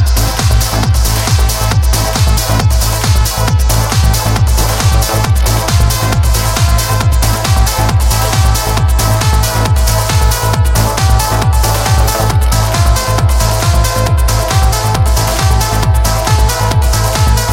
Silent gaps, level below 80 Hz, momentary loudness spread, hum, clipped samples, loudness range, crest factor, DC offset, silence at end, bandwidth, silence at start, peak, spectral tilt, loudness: none; -14 dBFS; 1 LU; none; under 0.1%; 0 LU; 10 dB; under 0.1%; 0 s; 17 kHz; 0 s; 0 dBFS; -4 dB/octave; -11 LUFS